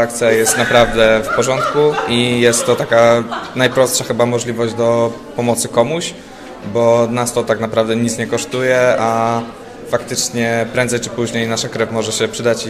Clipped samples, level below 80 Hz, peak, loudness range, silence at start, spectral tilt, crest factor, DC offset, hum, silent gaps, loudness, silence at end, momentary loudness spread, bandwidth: under 0.1%; -42 dBFS; 0 dBFS; 4 LU; 0 s; -4 dB/octave; 14 dB; under 0.1%; none; none; -15 LUFS; 0 s; 8 LU; 15 kHz